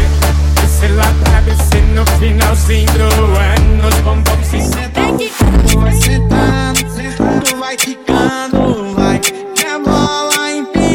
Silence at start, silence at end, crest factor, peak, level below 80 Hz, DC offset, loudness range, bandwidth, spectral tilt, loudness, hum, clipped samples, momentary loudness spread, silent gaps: 0 s; 0 s; 10 dB; 0 dBFS; -14 dBFS; under 0.1%; 3 LU; 17 kHz; -5 dB/octave; -12 LUFS; none; under 0.1%; 4 LU; none